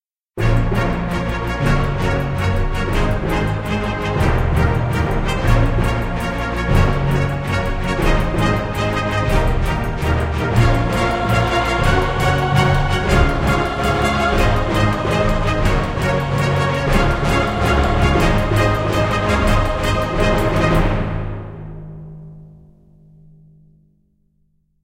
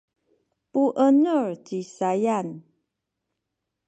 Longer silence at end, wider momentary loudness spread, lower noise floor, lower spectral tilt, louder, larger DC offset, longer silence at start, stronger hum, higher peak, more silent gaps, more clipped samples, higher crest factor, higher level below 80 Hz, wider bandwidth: first, 2.35 s vs 1.25 s; second, 5 LU vs 15 LU; second, -61 dBFS vs -82 dBFS; about the same, -6.5 dB/octave vs -7 dB/octave; first, -18 LUFS vs -23 LUFS; neither; second, 0.35 s vs 0.75 s; neither; first, 0 dBFS vs -8 dBFS; neither; neither; about the same, 16 dB vs 16 dB; first, -22 dBFS vs -80 dBFS; first, 16.5 kHz vs 8.6 kHz